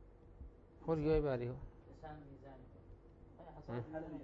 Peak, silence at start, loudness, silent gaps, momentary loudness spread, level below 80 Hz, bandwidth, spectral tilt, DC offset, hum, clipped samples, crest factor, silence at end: -24 dBFS; 0 s; -40 LUFS; none; 26 LU; -54 dBFS; 6 kHz; -8 dB/octave; under 0.1%; none; under 0.1%; 18 dB; 0 s